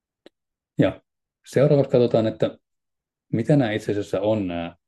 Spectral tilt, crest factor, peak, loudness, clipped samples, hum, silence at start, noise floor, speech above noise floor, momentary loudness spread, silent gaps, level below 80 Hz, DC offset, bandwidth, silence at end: -8 dB/octave; 18 dB; -6 dBFS; -22 LUFS; under 0.1%; none; 0.8 s; -84 dBFS; 63 dB; 9 LU; none; -60 dBFS; under 0.1%; 12.5 kHz; 0.15 s